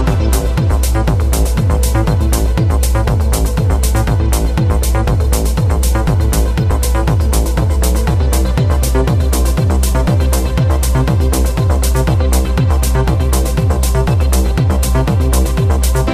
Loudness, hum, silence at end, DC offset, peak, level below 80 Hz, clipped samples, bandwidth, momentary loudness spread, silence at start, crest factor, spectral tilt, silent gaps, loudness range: -14 LUFS; none; 0 s; under 0.1%; 0 dBFS; -14 dBFS; under 0.1%; 15.5 kHz; 1 LU; 0 s; 10 dB; -6 dB/octave; none; 0 LU